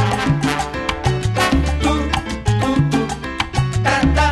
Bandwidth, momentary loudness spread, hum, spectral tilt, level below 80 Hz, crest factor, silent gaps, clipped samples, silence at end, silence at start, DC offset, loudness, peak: 12.5 kHz; 5 LU; none; -5.5 dB/octave; -26 dBFS; 16 dB; none; under 0.1%; 0 s; 0 s; under 0.1%; -18 LUFS; -2 dBFS